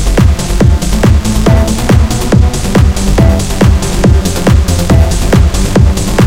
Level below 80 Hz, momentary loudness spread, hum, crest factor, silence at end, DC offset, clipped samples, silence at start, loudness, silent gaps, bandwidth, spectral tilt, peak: -12 dBFS; 1 LU; none; 8 dB; 0 s; under 0.1%; 2%; 0 s; -9 LUFS; none; 16.5 kHz; -6 dB/octave; 0 dBFS